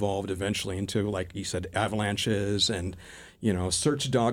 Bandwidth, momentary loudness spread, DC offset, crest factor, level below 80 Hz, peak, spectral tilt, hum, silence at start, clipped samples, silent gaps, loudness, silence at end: 16.5 kHz; 7 LU; under 0.1%; 18 dB; -52 dBFS; -10 dBFS; -4.5 dB/octave; none; 0 s; under 0.1%; none; -28 LUFS; 0 s